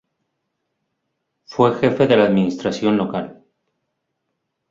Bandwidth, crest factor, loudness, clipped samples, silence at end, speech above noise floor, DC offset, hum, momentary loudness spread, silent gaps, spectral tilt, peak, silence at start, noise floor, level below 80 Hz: 7.6 kHz; 20 dB; -18 LUFS; under 0.1%; 1.4 s; 59 dB; under 0.1%; none; 13 LU; none; -7 dB/octave; -2 dBFS; 1.5 s; -75 dBFS; -58 dBFS